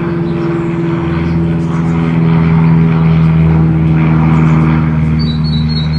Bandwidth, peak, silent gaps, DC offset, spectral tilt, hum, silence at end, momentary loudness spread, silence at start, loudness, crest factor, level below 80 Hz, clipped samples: 4.9 kHz; 0 dBFS; none; under 0.1%; -9 dB/octave; none; 0 s; 6 LU; 0 s; -11 LUFS; 10 dB; -28 dBFS; under 0.1%